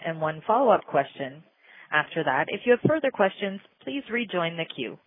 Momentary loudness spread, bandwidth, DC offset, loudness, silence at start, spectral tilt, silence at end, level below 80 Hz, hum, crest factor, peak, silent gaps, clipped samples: 13 LU; 3.9 kHz; under 0.1%; -26 LUFS; 0 s; -9.5 dB/octave; 0.1 s; -70 dBFS; none; 20 dB; -6 dBFS; none; under 0.1%